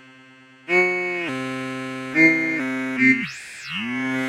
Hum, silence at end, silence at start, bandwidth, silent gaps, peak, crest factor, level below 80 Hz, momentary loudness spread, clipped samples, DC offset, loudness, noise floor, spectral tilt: none; 0 s; 0.05 s; 13.5 kHz; none; -4 dBFS; 18 dB; -70 dBFS; 14 LU; under 0.1%; under 0.1%; -21 LUFS; -49 dBFS; -5 dB/octave